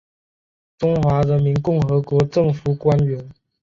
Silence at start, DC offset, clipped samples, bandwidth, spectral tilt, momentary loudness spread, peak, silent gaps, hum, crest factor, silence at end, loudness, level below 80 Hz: 0.8 s; under 0.1%; under 0.1%; 7.4 kHz; -9 dB/octave; 5 LU; -4 dBFS; none; none; 14 dB; 0.3 s; -19 LUFS; -44 dBFS